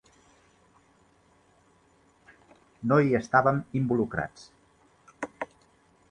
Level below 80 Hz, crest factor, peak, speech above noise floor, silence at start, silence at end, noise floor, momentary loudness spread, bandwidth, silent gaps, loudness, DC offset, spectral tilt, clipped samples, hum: -60 dBFS; 24 dB; -6 dBFS; 38 dB; 2.8 s; 0.65 s; -63 dBFS; 18 LU; 9.8 kHz; none; -27 LUFS; under 0.1%; -8 dB/octave; under 0.1%; none